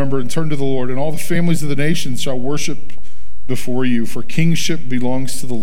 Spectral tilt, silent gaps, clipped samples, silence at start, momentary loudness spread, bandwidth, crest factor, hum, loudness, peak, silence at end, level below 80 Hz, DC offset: -5.5 dB/octave; none; under 0.1%; 0 s; 6 LU; 17 kHz; 18 dB; none; -20 LUFS; -2 dBFS; 0 s; -44 dBFS; 30%